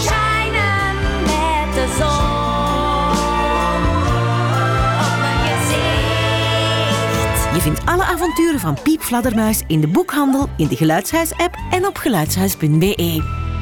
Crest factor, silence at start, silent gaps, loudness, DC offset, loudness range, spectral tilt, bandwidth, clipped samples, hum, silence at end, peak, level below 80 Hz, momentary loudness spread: 10 dB; 0 s; none; -17 LUFS; under 0.1%; 1 LU; -5 dB/octave; over 20 kHz; under 0.1%; none; 0 s; -6 dBFS; -28 dBFS; 3 LU